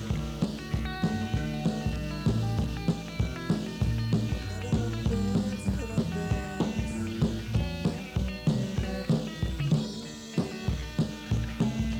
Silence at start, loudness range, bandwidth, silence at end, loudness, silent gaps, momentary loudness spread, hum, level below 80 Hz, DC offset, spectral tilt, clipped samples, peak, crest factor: 0 s; 1 LU; 17.5 kHz; 0 s; -31 LUFS; none; 4 LU; none; -38 dBFS; under 0.1%; -6.5 dB/octave; under 0.1%; -14 dBFS; 16 dB